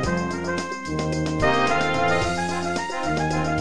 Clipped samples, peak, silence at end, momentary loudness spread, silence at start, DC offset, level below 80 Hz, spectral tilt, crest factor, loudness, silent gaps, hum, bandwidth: under 0.1%; -8 dBFS; 0 s; 7 LU; 0 s; 1%; -40 dBFS; -5 dB/octave; 14 dB; -23 LUFS; none; none; 10.5 kHz